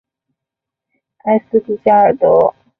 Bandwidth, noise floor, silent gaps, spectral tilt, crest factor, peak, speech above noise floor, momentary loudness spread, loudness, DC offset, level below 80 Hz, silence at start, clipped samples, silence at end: 4 kHz; -83 dBFS; none; -10 dB/octave; 14 dB; 0 dBFS; 71 dB; 7 LU; -13 LUFS; under 0.1%; -56 dBFS; 1.25 s; under 0.1%; 0.3 s